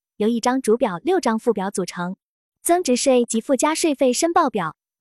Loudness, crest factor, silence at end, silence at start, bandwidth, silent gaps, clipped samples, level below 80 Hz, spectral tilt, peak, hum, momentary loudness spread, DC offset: -20 LUFS; 14 dB; 0.3 s; 0.2 s; 13.5 kHz; 2.22-2.52 s; under 0.1%; -64 dBFS; -4 dB/octave; -6 dBFS; none; 10 LU; under 0.1%